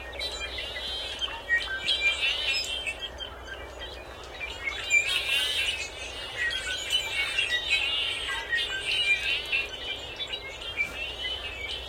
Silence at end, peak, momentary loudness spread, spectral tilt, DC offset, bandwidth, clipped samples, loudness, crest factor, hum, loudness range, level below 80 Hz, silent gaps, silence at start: 0 s; -12 dBFS; 13 LU; -0.5 dB/octave; under 0.1%; 16.5 kHz; under 0.1%; -27 LUFS; 20 dB; none; 2 LU; -48 dBFS; none; 0 s